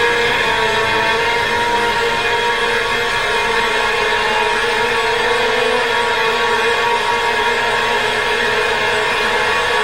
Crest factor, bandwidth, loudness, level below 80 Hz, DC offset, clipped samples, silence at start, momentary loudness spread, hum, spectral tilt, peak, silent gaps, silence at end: 12 dB; 16 kHz; -15 LUFS; -40 dBFS; under 0.1%; under 0.1%; 0 s; 1 LU; none; -2 dB/octave; -4 dBFS; none; 0 s